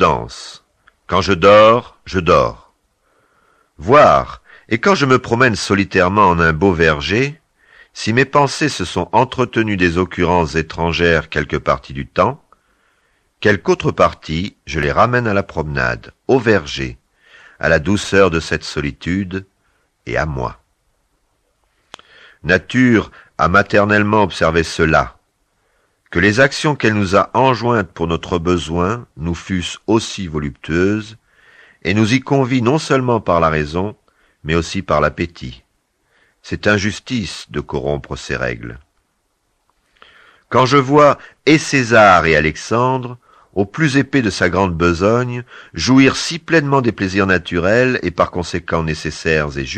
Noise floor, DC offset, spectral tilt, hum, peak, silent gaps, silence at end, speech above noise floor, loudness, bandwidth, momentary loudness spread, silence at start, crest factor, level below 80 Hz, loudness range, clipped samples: -66 dBFS; under 0.1%; -5.5 dB/octave; none; 0 dBFS; none; 0 s; 51 dB; -15 LUFS; 10 kHz; 12 LU; 0 s; 16 dB; -38 dBFS; 8 LU; under 0.1%